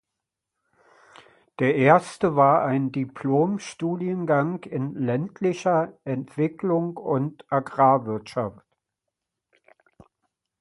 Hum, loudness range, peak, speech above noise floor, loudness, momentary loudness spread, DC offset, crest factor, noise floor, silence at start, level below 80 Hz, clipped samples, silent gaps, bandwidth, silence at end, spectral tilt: none; 4 LU; -2 dBFS; 62 dB; -24 LUFS; 11 LU; under 0.1%; 22 dB; -85 dBFS; 1.6 s; -66 dBFS; under 0.1%; none; 11.5 kHz; 2.1 s; -7.5 dB/octave